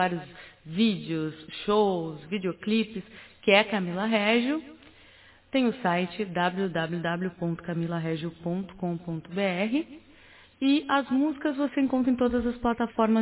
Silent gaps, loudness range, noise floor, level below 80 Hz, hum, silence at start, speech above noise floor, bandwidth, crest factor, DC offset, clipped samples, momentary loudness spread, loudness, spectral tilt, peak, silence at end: none; 4 LU; -55 dBFS; -56 dBFS; none; 0 s; 28 dB; 4 kHz; 22 dB; under 0.1%; under 0.1%; 10 LU; -27 LUFS; -4.5 dB/octave; -6 dBFS; 0 s